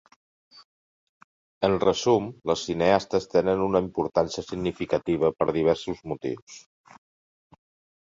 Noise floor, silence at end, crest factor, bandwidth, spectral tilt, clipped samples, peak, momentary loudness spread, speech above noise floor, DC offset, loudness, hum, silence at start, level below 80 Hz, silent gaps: under -90 dBFS; 1.4 s; 22 dB; 7.8 kHz; -5.5 dB/octave; under 0.1%; -6 dBFS; 10 LU; over 65 dB; under 0.1%; -25 LUFS; none; 0.55 s; -54 dBFS; 0.64-1.61 s, 6.42-6.47 s